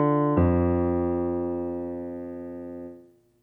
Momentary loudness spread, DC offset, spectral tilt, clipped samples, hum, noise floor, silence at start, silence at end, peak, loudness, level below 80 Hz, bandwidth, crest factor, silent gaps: 16 LU; under 0.1%; -12 dB/octave; under 0.1%; 50 Hz at -75 dBFS; -52 dBFS; 0 s; 0.4 s; -10 dBFS; -26 LUFS; -44 dBFS; 3.4 kHz; 16 dB; none